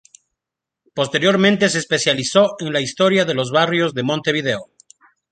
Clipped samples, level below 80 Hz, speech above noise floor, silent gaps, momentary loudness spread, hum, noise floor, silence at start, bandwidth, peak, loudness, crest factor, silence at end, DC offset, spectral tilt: under 0.1%; -60 dBFS; 68 dB; none; 7 LU; none; -85 dBFS; 0.95 s; 9.4 kHz; -2 dBFS; -17 LUFS; 18 dB; 0.7 s; under 0.1%; -4 dB/octave